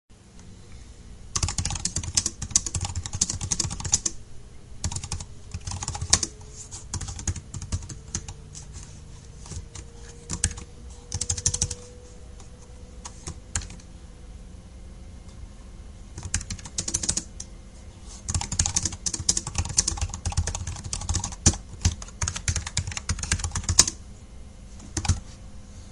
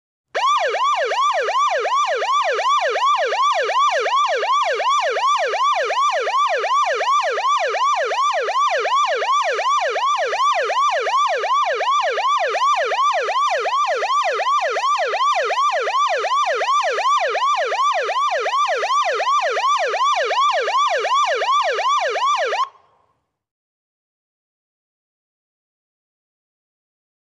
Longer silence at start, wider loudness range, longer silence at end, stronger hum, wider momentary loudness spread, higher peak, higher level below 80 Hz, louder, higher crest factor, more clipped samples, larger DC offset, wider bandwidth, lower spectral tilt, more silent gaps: second, 0.1 s vs 0.35 s; first, 11 LU vs 1 LU; second, 0 s vs 4.65 s; neither; first, 22 LU vs 1 LU; first, 0 dBFS vs -10 dBFS; first, -36 dBFS vs -82 dBFS; second, -27 LUFS vs -18 LUFS; first, 30 dB vs 10 dB; neither; neither; first, 16 kHz vs 11 kHz; first, -2 dB/octave vs 1.5 dB/octave; neither